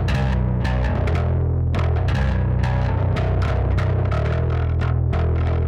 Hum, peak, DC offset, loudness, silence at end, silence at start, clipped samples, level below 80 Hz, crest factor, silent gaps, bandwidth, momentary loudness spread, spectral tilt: none; -8 dBFS; under 0.1%; -21 LUFS; 0 s; 0 s; under 0.1%; -24 dBFS; 10 dB; none; 7.2 kHz; 1 LU; -8.5 dB/octave